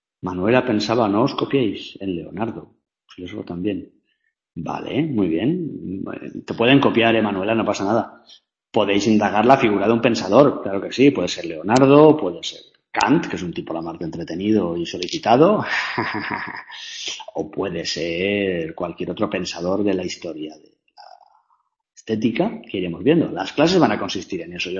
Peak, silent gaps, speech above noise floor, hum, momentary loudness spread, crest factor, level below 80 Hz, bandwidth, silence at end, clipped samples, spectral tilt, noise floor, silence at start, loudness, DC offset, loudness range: 0 dBFS; none; 51 dB; none; 15 LU; 20 dB; -56 dBFS; 8.2 kHz; 0 s; under 0.1%; -5.5 dB/octave; -71 dBFS; 0.25 s; -20 LUFS; under 0.1%; 9 LU